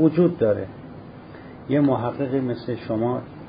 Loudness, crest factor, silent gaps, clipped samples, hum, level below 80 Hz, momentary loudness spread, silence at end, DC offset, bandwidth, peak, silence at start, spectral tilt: -23 LUFS; 18 dB; none; under 0.1%; none; -54 dBFS; 21 LU; 0 s; under 0.1%; 5.2 kHz; -6 dBFS; 0 s; -13 dB/octave